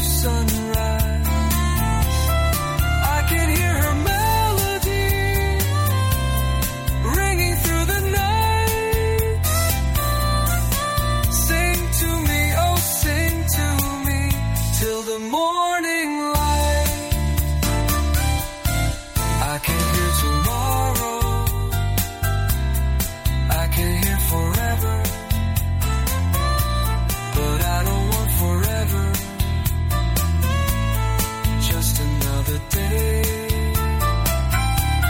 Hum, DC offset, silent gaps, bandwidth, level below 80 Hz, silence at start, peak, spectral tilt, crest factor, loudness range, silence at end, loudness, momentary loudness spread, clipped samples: none; under 0.1%; none; 17 kHz; -24 dBFS; 0 s; -6 dBFS; -4.5 dB/octave; 14 dB; 2 LU; 0 s; -20 LUFS; 4 LU; under 0.1%